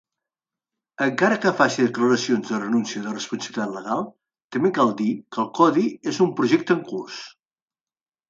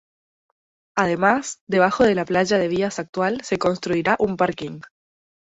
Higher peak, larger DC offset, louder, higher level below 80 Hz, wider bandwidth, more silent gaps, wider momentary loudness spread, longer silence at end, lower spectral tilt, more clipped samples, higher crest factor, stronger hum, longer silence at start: about the same, -4 dBFS vs -4 dBFS; neither; about the same, -22 LUFS vs -21 LUFS; second, -70 dBFS vs -54 dBFS; about the same, 7.8 kHz vs 8.2 kHz; about the same, 4.44-4.50 s vs 1.61-1.67 s, 3.09-3.13 s; first, 11 LU vs 7 LU; first, 1 s vs 0.6 s; about the same, -5 dB/octave vs -5 dB/octave; neither; about the same, 20 dB vs 18 dB; neither; about the same, 1 s vs 0.95 s